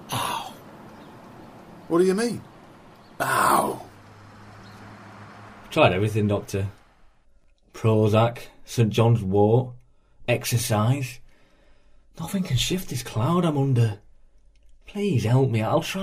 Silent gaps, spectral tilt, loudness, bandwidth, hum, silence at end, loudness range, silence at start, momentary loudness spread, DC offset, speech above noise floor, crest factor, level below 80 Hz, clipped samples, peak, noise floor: none; -6 dB/octave; -23 LUFS; 15.5 kHz; none; 0 s; 4 LU; 0 s; 24 LU; under 0.1%; 35 dB; 22 dB; -50 dBFS; under 0.1%; -4 dBFS; -57 dBFS